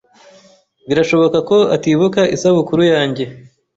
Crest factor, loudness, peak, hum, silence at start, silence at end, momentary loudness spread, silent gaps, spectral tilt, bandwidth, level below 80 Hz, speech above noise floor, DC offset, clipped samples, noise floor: 12 dB; -14 LUFS; -2 dBFS; none; 0.9 s; 0.35 s; 7 LU; none; -6 dB/octave; 8 kHz; -54 dBFS; 35 dB; under 0.1%; under 0.1%; -49 dBFS